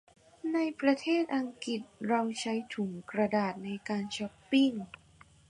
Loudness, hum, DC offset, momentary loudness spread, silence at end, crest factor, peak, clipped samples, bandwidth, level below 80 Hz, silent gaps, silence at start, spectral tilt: -32 LUFS; none; under 0.1%; 10 LU; 0.65 s; 18 dB; -14 dBFS; under 0.1%; 10.5 kHz; -72 dBFS; none; 0.45 s; -5 dB/octave